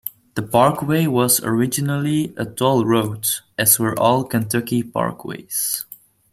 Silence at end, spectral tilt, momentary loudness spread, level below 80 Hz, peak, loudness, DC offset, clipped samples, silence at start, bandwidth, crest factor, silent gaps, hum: 0.4 s; -4.5 dB/octave; 10 LU; -56 dBFS; 0 dBFS; -19 LUFS; under 0.1%; under 0.1%; 0.05 s; 16 kHz; 20 dB; none; none